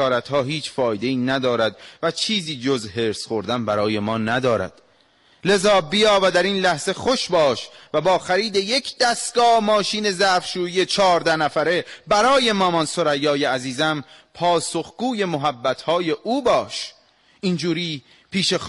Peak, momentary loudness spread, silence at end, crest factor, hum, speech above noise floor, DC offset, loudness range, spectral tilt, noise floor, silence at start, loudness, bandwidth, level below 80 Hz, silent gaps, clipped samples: -8 dBFS; 9 LU; 0 s; 14 dB; none; 37 dB; under 0.1%; 4 LU; -4 dB/octave; -57 dBFS; 0 s; -20 LUFS; 11.5 kHz; -56 dBFS; none; under 0.1%